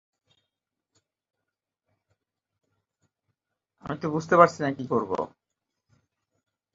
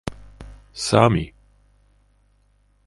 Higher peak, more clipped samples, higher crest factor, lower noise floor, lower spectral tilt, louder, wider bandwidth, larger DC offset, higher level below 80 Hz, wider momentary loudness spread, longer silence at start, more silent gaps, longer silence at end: about the same, -2 dBFS vs 0 dBFS; neither; about the same, 28 dB vs 24 dB; first, -86 dBFS vs -61 dBFS; about the same, -6.5 dB/octave vs -5.5 dB/octave; second, -24 LUFS vs -19 LUFS; second, 7.8 kHz vs 11.5 kHz; neither; second, -68 dBFS vs -44 dBFS; second, 18 LU vs 27 LU; first, 3.85 s vs 0.05 s; neither; about the same, 1.5 s vs 1.6 s